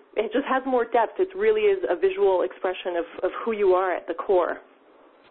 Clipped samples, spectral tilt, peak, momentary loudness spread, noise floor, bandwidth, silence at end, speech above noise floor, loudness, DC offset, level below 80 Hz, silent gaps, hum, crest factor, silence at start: under 0.1%; -8.5 dB/octave; -10 dBFS; 8 LU; -54 dBFS; 4.1 kHz; 0.7 s; 31 dB; -24 LUFS; under 0.1%; -60 dBFS; none; none; 14 dB; 0.15 s